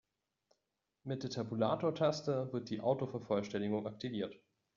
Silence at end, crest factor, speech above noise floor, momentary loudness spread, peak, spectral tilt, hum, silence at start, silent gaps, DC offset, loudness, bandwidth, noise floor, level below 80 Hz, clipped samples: 0.4 s; 20 dB; 50 dB; 9 LU; -20 dBFS; -6 dB/octave; none; 1.05 s; none; under 0.1%; -37 LUFS; 7.4 kHz; -87 dBFS; -76 dBFS; under 0.1%